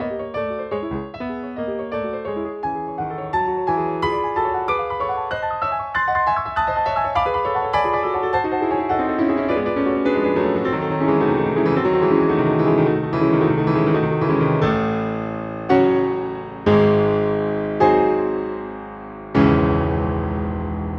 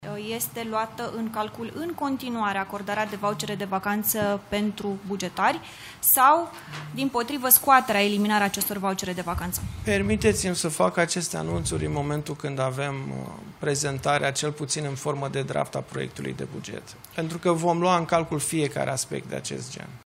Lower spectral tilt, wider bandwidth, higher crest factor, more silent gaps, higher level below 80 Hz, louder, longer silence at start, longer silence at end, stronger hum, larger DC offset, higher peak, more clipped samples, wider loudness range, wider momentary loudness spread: first, -9 dB/octave vs -4 dB/octave; second, 6.6 kHz vs 16 kHz; second, 18 dB vs 24 dB; neither; first, -40 dBFS vs -50 dBFS; first, -20 LUFS vs -25 LUFS; about the same, 0 s vs 0 s; about the same, 0 s vs 0.05 s; neither; neither; about the same, -2 dBFS vs -2 dBFS; neither; second, 5 LU vs 8 LU; second, 10 LU vs 14 LU